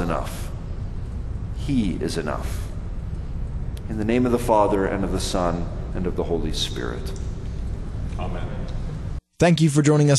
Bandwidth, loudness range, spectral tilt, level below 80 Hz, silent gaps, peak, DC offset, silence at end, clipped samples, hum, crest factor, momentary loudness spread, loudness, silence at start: 12.5 kHz; 6 LU; -6 dB/octave; -30 dBFS; none; -4 dBFS; under 0.1%; 0 s; under 0.1%; none; 20 dB; 14 LU; -25 LUFS; 0 s